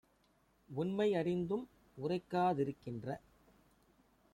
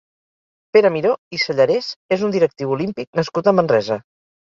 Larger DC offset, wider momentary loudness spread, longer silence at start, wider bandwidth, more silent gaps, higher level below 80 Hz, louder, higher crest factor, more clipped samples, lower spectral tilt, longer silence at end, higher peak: neither; first, 12 LU vs 8 LU; about the same, 0.7 s vs 0.75 s; first, 12.5 kHz vs 7.4 kHz; second, none vs 1.18-1.31 s, 1.96-2.09 s, 3.07-3.13 s; second, -72 dBFS vs -60 dBFS; second, -38 LUFS vs -18 LUFS; about the same, 16 dB vs 16 dB; neither; first, -8 dB/octave vs -6 dB/octave; first, 1.15 s vs 0.5 s; second, -22 dBFS vs -2 dBFS